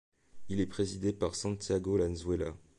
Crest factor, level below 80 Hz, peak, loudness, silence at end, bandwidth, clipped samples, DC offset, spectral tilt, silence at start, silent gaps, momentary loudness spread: 14 dB; -50 dBFS; -20 dBFS; -34 LUFS; 0 s; 11.5 kHz; under 0.1%; under 0.1%; -6 dB/octave; 0.1 s; none; 5 LU